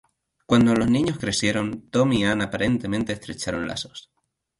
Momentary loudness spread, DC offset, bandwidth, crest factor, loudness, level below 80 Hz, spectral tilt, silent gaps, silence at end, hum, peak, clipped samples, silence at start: 11 LU; under 0.1%; 11.5 kHz; 18 dB; -23 LUFS; -48 dBFS; -5 dB/octave; none; 0.6 s; none; -6 dBFS; under 0.1%; 0.5 s